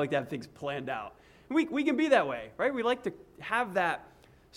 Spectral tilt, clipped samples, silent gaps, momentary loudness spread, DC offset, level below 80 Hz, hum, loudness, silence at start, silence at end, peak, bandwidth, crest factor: -5.5 dB/octave; under 0.1%; none; 14 LU; under 0.1%; -66 dBFS; none; -31 LUFS; 0 s; 0.5 s; -12 dBFS; 14 kHz; 20 dB